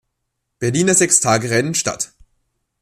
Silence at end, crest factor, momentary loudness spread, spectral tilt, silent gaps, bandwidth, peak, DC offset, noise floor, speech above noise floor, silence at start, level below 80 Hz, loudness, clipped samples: 0.75 s; 18 dB; 13 LU; -3.5 dB/octave; none; 14.5 kHz; 0 dBFS; under 0.1%; -75 dBFS; 58 dB; 0.6 s; -56 dBFS; -16 LUFS; under 0.1%